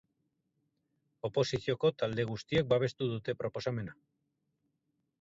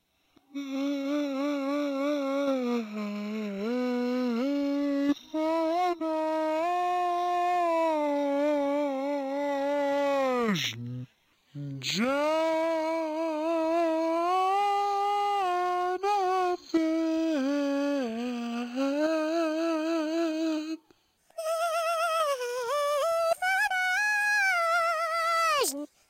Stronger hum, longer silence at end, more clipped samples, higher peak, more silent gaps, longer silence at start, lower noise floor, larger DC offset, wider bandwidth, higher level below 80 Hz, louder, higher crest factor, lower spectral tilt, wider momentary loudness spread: neither; first, 1.3 s vs 0.25 s; neither; about the same, -16 dBFS vs -16 dBFS; neither; first, 1.25 s vs 0.55 s; first, -82 dBFS vs -66 dBFS; neither; second, 7.8 kHz vs 16 kHz; first, -64 dBFS vs -74 dBFS; second, -33 LUFS vs -28 LUFS; first, 20 dB vs 12 dB; first, -6 dB/octave vs -4 dB/octave; about the same, 8 LU vs 7 LU